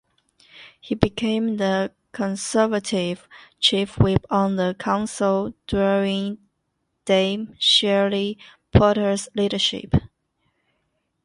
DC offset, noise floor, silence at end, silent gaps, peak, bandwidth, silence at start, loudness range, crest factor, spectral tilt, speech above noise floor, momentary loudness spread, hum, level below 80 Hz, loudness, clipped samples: under 0.1%; -74 dBFS; 1.2 s; none; 0 dBFS; 11.5 kHz; 0.55 s; 3 LU; 22 dB; -5 dB/octave; 53 dB; 11 LU; none; -40 dBFS; -21 LUFS; under 0.1%